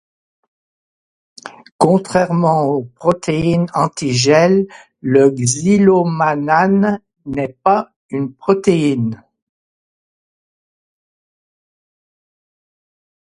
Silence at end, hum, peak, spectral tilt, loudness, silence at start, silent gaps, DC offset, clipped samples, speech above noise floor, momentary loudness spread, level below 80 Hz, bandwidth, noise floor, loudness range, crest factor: 4.15 s; none; 0 dBFS; -5.5 dB/octave; -15 LUFS; 1.45 s; 1.72-1.79 s, 7.96-8.09 s; under 0.1%; under 0.1%; over 76 dB; 12 LU; -52 dBFS; 11.5 kHz; under -90 dBFS; 7 LU; 16 dB